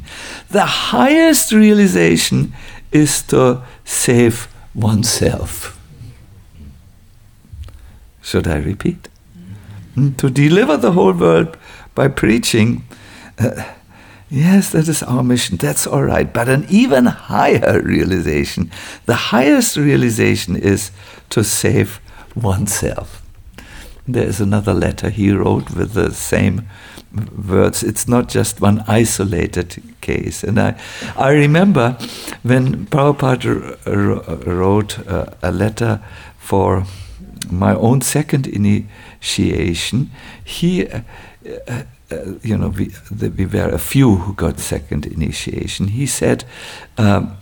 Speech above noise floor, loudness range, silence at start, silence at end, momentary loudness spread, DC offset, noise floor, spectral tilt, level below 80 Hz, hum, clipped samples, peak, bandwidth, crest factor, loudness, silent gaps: 30 dB; 7 LU; 0 s; 0 s; 15 LU; 0.1%; -44 dBFS; -5.5 dB/octave; -36 dBFS; none; under 0.1%; 0 dBFS; 19 kHz; 14 dB; -15 LUFS; none